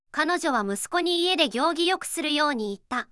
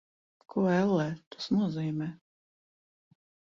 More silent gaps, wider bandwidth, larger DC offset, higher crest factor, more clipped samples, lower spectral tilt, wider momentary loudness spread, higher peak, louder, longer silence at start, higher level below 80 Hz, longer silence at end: second, none vs 1.26-1.31 s; first, 12 kHz vs 7.2 kHz; neither; about the same, 18 dB vs 16 dB; neither; second, -2.5 dB/octave vs -7.5 dB/octave; second, 6 LU vs 11 LU; first, -8 dBFS vs -16 dBFS; first, -24 LUFS vs -30 LUFS; second, 0.15 s vs 0.55 s; about the same, -66 dBFS vs -70 dBFS; second, 0.05 s vs 1.35 s